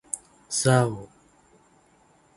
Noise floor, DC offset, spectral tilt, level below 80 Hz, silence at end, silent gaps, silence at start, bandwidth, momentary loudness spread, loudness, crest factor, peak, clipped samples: -60 dBFS; under 0.1%; -4.5 dB/octave; -60 dBFS; 1.3 s; none; 0.15 s; 11.5 kHz; 15 LU; -24 LUFS; 22 dB; -6 dBFS; under 0.1%